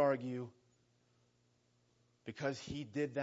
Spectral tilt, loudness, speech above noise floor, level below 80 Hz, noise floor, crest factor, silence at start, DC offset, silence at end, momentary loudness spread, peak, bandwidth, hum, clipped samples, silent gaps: -5.5 dB/octave; -41 LUFS; 34 dB; -74 dBFS; -75 dBFS; 20 dB; 0 s; under 0.1%; 0 s; 14 LU; -20 dBFS; 7.6 kHz; 60 Hz at -75 dBFS; under 0.1%; none